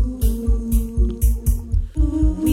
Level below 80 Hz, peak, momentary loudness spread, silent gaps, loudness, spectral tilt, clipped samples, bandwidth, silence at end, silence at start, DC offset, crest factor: -20 dBFS; -6 dBFS; 3 LU; none; -21 LUFS; -7.5 dB/octave; under 0.1%; 16 kHz; 0 s; 0 s; under 0.1%; 12 dB